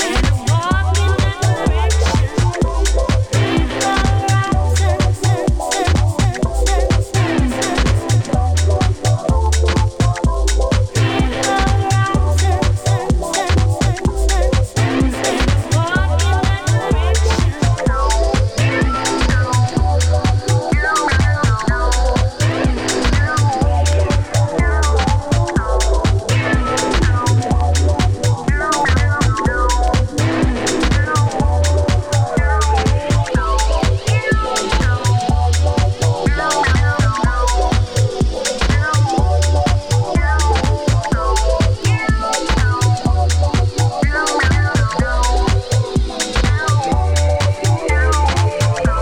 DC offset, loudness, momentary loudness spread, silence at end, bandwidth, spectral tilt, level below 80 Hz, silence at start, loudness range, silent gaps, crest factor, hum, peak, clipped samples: under 0.1%; -16 LUFS; 2 LU; 0 s; 15.5 kHz; -5 dB/octave; -20 dBFS; 0 s; 1 LU; none; 12 dB; none; -2 dBFS; under 0.1%